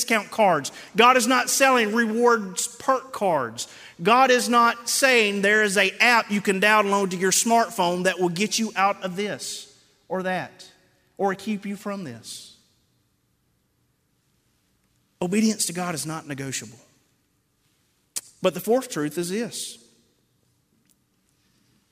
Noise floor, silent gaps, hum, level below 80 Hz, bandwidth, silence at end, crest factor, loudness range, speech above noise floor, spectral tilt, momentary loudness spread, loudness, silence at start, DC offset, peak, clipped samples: -69 dBFS; none; none; -72 dBFS; 16 kHz; 2.15 s; 20 dB; 14 LU; 47 dB; -3 dB/octave; 15 LU; -22 LUFS; 0 s; under 0.1%; -4 dBFS; under 0.1%